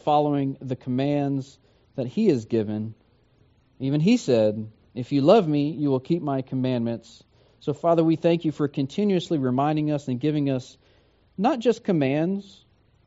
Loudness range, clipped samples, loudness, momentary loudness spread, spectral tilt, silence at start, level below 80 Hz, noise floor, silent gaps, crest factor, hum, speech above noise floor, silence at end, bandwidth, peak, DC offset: 4 LU; under 0.1%; -24 LUFS; 12 LU; -7 dB/octave; 0.05 s; -64 dBFS; -60 dBFS; none; 20 dB; none; 37 dB; 0.65 s; 8 kHz; -4 dBFS; under 0.1%